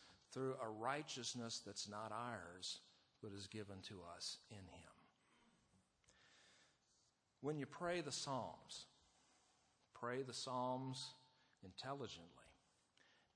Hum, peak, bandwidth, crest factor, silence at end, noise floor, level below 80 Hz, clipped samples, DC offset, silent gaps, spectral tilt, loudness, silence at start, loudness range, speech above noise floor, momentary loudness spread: none; -30 dBFS; 10.5 kHz; 22 dB; 0.8 s; -81 dBFS; -84 dBFS; under 0.1%; under 0.1%; none; -3.5 dB/octave; -49 LUFS; 0 s; 9 LU; 32 dB; 19 LU